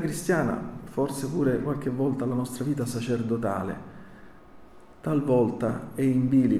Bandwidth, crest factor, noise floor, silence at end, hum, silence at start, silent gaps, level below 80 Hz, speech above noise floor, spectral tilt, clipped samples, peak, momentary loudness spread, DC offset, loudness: 14.5 kHz; 16 dB; -48 dBFS; 0 s; none; 0 s; none; -54 dBFS; 22 dB; -7 dB/octave; under 0.1%; -12 dBFS; 10 LU; under 0.1%; -27 LUFS